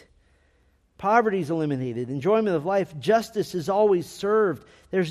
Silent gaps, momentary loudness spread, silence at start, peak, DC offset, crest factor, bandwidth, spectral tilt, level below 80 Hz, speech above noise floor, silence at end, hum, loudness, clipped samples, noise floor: none; 8 LU; 1 s; -6 dBFS; under 0.1%; 18 dB; 14.5 kHz; -6.5 dB/octave; -62 dBFS; 40 dB; 0 s; none; -24 LUFS; under 0.1%; -63 dBFS